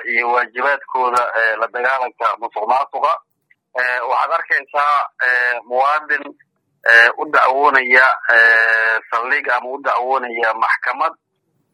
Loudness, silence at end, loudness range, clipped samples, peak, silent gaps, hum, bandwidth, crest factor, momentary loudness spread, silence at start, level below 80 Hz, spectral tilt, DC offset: -15 LUFS; 0.6 s; 6 LU; under 0.1%; 0 dBFS; none; none; 12.5 kHz; 16 dB; 10 LU; 0 s; -78 dBFS; -1.5 dB/octave; under 0.1%